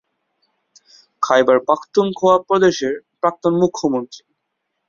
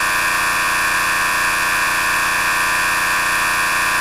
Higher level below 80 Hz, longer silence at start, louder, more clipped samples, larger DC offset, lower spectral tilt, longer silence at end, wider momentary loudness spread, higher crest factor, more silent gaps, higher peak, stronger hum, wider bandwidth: second, -62 dBFS vs -42 dBFS; first, 1.2 s vs 0 s; about the same, -17 LUFS vs -15 LUFS; neither; neither; first, -5.5 dB/octave vs -0.5 dB/octave; first, 0.7 s vs 0 s; first, 10 LU vs 0 LU; first, 16 dB vs 10 dB; neither; first, -2 dBFS vs -8 dBFS; neither; second, 7.4 kHz vs 14 kHz